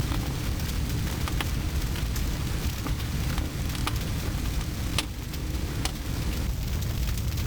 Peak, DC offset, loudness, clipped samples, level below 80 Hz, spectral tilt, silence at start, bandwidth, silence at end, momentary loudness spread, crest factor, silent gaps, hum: -12 dBFS; 0.4%; -30 LUFS; under 0.1%; -32 dBFS; -4.5 dB/octave; 0 s; over 20 kHz; 0 s; 2 LU; 18 dB; none; none